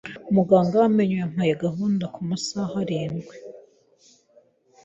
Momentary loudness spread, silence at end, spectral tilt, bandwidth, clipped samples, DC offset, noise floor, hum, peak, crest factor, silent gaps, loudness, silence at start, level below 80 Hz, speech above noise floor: 15 LU; 1.25 s; -7 dB/octave; 8 kHz; under 0.1%; under 0.1%; -59 dBFS; none; -4 dBFS; 20 dB; none; -23 LUFS; 0.05 s; -62 dBFS; 37 dB